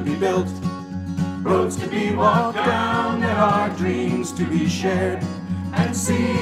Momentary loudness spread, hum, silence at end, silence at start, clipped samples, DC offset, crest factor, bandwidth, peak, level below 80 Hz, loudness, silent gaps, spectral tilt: 9 LU; none; 0 s; 0 s; under 0.1%; under 0.1%; 16 dB; 15 kHz; -4 dBFS; -50 dBFS; -21 LUFS; none; -5.5 dB/octave